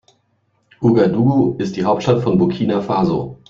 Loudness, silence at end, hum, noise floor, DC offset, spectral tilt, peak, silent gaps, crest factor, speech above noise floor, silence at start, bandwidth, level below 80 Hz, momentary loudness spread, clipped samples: -16 LUFS; 0.15 s; none; -64 dBFS; under 0.1%; -8.5 dB/octave; -2 dBFS; none; 14 dB; 48 dB; 0.8 s; 7.4 kHz; -50 dBFS; 5 LU; under 0.1%